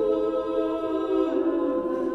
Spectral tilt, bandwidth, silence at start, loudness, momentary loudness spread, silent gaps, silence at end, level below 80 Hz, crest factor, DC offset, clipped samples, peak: -7 dB/octave; 6.2 kHz; 0 s; -26 LUFS; 2 LU; none; 0 s; -56 dBFS; 12 dB; under 0.1%; under 0.1%; -12 dBFS